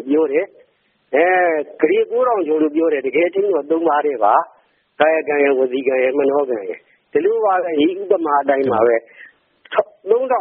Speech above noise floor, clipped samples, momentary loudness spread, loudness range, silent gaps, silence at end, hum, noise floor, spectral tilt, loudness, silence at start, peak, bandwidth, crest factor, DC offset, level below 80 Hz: 44 dB; under 0.1%; 6 LU; 1 LU; none; 0 s; none; -60 dBFS; -3 dB/octave; -17 LUFS; 0 s; 0 dBFS; 3.7 kHz; 16 dB; under 0.1%; -68 dBFS